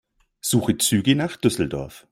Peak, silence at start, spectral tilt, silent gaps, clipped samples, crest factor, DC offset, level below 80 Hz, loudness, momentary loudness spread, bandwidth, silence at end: -4 dBFS; 0.45 s; -4.5 dB/octave; none; under 0.1%; 18 dB; under 0.1%; -50 dBFS; -21 LUFS; 9 LU; 16.5 kHz; 0.15 s